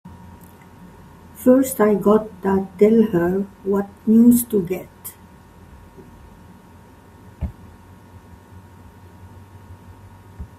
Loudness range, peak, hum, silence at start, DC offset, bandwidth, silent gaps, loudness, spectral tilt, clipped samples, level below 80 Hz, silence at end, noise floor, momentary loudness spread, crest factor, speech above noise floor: 23 LU; -2 dBFS; none; 0.05 s; under 0.1%; 16 kHz; none; -18 LUFS; -7 dB/octave; under 0.1%; -46 dBFS; 0.15 s; -46 dBFS; 19 LU; 20 dB; 29 dB